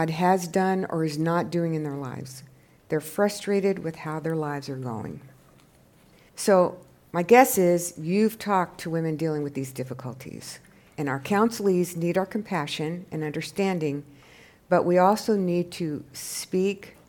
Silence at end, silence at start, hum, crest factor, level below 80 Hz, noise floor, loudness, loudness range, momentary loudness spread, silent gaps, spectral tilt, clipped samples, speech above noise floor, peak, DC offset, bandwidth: 0.2 s; 0 s; none; 24 dB; -66 dBFS; -57 dBFS; -25 LUFS; 6 LU; 15 LU; none; -5.5 dB/octave; under 0.1%; 32 dB; -2 dBFS; under 0.1%; 18 kHz